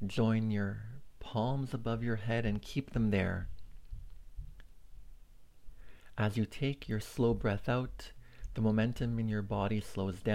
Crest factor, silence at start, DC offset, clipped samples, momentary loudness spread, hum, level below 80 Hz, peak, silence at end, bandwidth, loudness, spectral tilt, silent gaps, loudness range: 16 dB; 0 s; under 0.1%; under 0.1%; 21 LU; none; -50 dBFS; -18 dBFS; 0 s; 15.5 kHz; -35 LUFS; -7.5 dB/octave; none; 6 LU